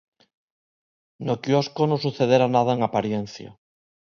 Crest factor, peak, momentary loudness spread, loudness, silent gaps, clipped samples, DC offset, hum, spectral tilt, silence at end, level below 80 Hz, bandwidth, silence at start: 20 dB; -4 dBFS; 13 LU; -22 LUFS; none; under 0.1%; under 0.1%; none; -6.5 dB/octave; 0.65 s; -64 dBFS; 7.2 kHz; 1.2 s